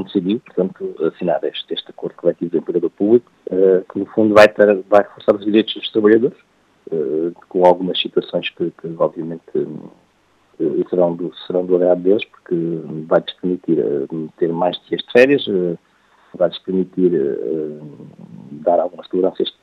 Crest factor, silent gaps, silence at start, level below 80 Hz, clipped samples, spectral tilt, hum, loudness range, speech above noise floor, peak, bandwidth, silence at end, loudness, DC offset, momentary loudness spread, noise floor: 18 dB; none; 0 s; -64 dBFS; under 0.1%; -7 dB/octave; none; 7 LU; 40 dB; 0 dBFS; 10 kHz; 0.15 s; -18 LUFS; under 0.1%; 11 LU; -58 dBFS